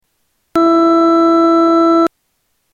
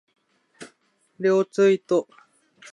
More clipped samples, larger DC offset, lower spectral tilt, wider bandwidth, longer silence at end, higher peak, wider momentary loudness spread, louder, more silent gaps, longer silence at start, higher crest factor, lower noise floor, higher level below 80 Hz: neither; neither; about the same, -5.5 dB/octave vs -6 dB/octave; second, 7 kHz vs 10.5 kHz; about the same, 0.65 s vs 0.7 s; first, -2 dBFS vs -8 dBFS; about the same, 5 LU vs 6 LU; first, -11 LUFS vs -22 LUFS; neither; about the same, 0.55 s vs 0.6 s; second, 10 dB vs 16 dB; about the same, -65 dBFS vs -64 dBFS; first, -56 dBFS vs -84 dBFS